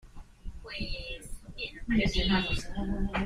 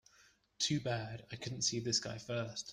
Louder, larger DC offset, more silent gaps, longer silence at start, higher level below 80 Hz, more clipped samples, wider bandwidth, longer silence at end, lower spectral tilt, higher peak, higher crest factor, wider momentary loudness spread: first, -32 LUFS vs -37 LUFS; neither; neither; second, 0.05 s vs 0.6 s; first, -38 dBFS vs -70 dBFS; neither; about the same, 14 kHz vs 14.5 kHz; about the same, 0 s vs 0 s; first, -5 dB/octave vs -3.5 dB/octave; first, -14 dBFS vs -20 dBFS; about the same, 16 dB vs 20 dB; first, 19 LU vs 10 LU